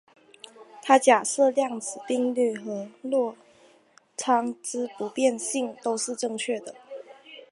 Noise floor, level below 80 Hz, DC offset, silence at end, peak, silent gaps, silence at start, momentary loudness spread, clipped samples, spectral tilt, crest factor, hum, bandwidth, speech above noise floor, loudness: -59 dBFS; -84 dBFS; under 0.1%; 0.1 s; -4 dBFS; none; 0.6 s; 22 LU; under 0.1%; -2.5 dB/octave; 22 dB; none; 11.5 kHz; 34 dB; -26 LUFS